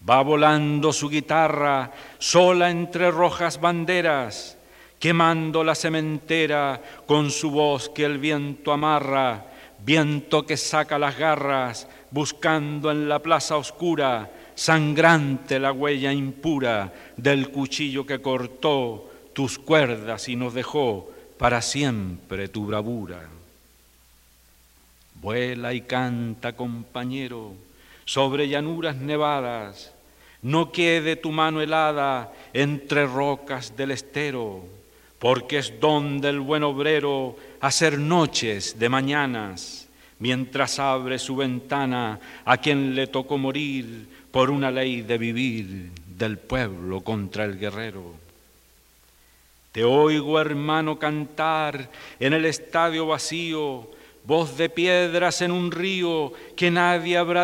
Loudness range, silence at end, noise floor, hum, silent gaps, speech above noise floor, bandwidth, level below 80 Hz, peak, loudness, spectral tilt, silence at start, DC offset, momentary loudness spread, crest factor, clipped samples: 7 LU; 0 s; -57 dBFS; none; none; 34 dB; 16 kHz; -56 dBFS; -2 dBFS; -23 LUFS; -4.5 dB/octave; 0 s; under 0.1%; 12 LU; 22 dB; under 0.1%